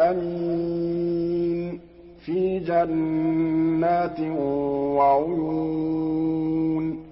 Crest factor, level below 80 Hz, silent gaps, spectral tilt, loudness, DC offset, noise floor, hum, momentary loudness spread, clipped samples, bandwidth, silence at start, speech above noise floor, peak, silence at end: 14 dB; -52 dBFS; none; -12.5 dB/octave; -24 LUFS; under 0.1%; -46 dBFS; none; 6 LU; under 0.1%; 5.8 kHz; 0 s; 23 dB; -10 dBFS; 0 s